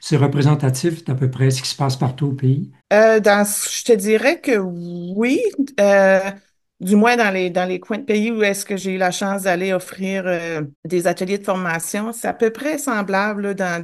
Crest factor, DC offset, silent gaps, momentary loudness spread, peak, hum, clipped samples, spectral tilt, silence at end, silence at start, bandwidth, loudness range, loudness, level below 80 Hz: 16 dB; under 0.1%; 10.76-10.83 s; 9 LU; -2 dBFS; none; under 0.1%; -5.5 dB/octave; 0 s; 0 s; 12.5 kHz; 5 LU; -18 LUFS; -62 dBFS